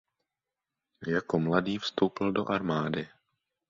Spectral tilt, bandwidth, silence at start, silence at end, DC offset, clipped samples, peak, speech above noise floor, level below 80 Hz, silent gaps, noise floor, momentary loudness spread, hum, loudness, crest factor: -6.5 dB/octave; 7.6 kHz; 1 s; 0.6 s; under 0.1%; under 0.1%; -10 dBFS; 60 dB; -64 dBFS; none; -89 dBFS; 8 LU; none; -30 LUFS; 22 dB